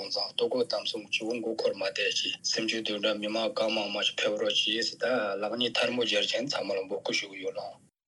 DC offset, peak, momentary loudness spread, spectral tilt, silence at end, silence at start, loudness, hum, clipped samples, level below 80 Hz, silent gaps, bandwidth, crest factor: under 0.1%; -12 dBFS; 6 LU; -2 dB/octave; 0.3 s; 0 s; -29 LUFS; none; under 0.1%; -84 dBFS; none; 11.5 kHz; 18 dB